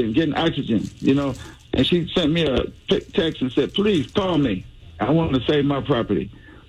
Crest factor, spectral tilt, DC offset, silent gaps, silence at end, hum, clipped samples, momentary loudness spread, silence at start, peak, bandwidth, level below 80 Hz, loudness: 12 dB; -7 dB/octave; under 0.1%; none; 0.1 s; none; under 0.1%; 6 LU; 0 s; -8 dBFS; 11.5 kHz; -42 dBFS; -21 LUFS